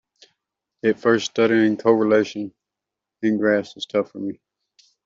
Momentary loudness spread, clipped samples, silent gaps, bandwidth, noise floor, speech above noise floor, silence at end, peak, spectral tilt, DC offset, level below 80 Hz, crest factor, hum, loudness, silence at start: 13 LU; under 0.1%; none; 7.6 kHz; -85 dBFS; 66 dB; 0.7 s; -4 dBFS; -5.5 dB/octave; under 0.1%; -70 dBFS; 18 dB; none; -20 LUFS; 0.85 s